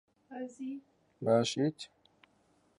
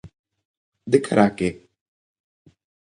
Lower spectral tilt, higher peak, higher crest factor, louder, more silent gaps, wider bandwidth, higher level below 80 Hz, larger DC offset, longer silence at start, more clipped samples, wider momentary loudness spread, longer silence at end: about the same, -5.5 dB/octave vs -6.5 dB/octave; second, -16 dBFS vs -2 dBFS; about the same, 20 dB vs 24 dB; second, -34 LUFS vs -20 LUFS; second, none vs 0.19-0.24 s, 0.45-0.72 s; about the same, 11.5 kHz vs 10.5 kHz; second, -78 dBFS vs -56 dBFS; neither; first, 0.3 s vs 0.05 s; neither; first, 20 LU vs 11 LU; second, 0.9 s vs 1.35 s